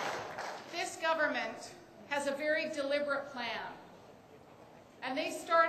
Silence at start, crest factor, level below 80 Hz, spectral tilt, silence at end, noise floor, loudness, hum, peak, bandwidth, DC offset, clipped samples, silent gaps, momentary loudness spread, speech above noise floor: 0 s; 22 dB; -76 dBFS; -2.5 dB/octave; 0 s; -57 dBFS; -36 LUFS; none; -14 dBFS; 15.5 kHz; under 0.1%; under 0.1%; none; 24 LU; 22 dB